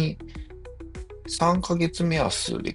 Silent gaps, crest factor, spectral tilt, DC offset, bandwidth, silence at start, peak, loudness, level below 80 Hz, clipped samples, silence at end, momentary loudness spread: none; 18 dB; -5 dB/octave; under 0.1%; 11.5 kHz; 0 s; -8 dBFS; -25 LUFS; -42 dBFS; under 0.1%; 0 s; 18 LU